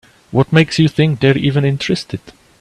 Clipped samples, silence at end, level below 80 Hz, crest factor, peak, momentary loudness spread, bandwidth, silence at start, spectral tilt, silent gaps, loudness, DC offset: under 0.1%; 0.3 s; -46 dBFS; 14 dB; 0 dBFS; 8 LU; 10.5 kHz; 0.3 s; -6.5 dB/octave; none; -14 LUFS; under 0.1%